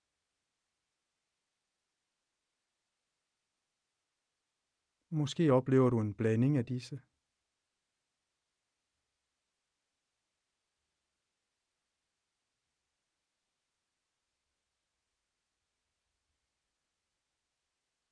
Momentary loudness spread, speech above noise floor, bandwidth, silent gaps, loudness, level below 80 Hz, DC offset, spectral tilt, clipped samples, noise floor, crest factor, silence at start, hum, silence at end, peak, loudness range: 14 LU; 57 dB; 10 kHz; none; -31 LUFS; -76 dBFS; under 0.1%; -8 dB/octave; under 0.1%; -88 dBFS; 24 dB; 5.1 s; none; 11.15 s; -16 dBFS; 11 LU